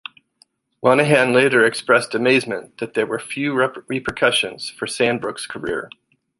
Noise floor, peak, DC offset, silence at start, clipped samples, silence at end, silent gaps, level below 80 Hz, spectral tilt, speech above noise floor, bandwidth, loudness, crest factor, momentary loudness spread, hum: -59 dBFS; -2 dBFS; under 0.1%; 0.85 s; under 0.1%; 0.5 s; none; -56 dBFS; -4 dB/octave; 40 dB; 11.5 kHz; -19 LUFS; 18 dB; 13 LU; none